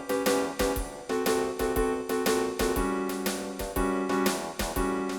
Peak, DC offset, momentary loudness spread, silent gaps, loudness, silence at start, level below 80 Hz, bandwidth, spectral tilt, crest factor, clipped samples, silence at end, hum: -14 dBFS; under 0.1%; 5 LU; none; -29 LUFS; 0 s; -42 dBFS; 19 kHz; -4 dB/octave; 16 dB; under 0.1%; 0 s; none